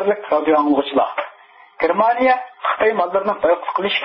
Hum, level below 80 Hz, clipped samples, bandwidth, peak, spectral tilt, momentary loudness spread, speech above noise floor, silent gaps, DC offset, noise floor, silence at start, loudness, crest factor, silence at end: none; -60 dBFS; under 0.1%; 5.8 kHz; -4 dBFS; -9.5 dB/octave; 7 LU; 29 dB; none; under 0.1%; -46 dBFS; 0 s; -18 LUFS; 14 dB; 0 s